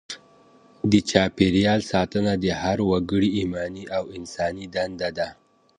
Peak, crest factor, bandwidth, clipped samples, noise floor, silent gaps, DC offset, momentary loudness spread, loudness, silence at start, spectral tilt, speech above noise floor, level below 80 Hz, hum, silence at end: 0 dBFS; 22 dB; 10 kHz; under 0.1%; -54 dBFS; none; under 0.1%; 11 LU; -23 LUFS; 0.1 s; -5.5 dB/octave; 31 dB; -46 dBFS; none; 0.45 s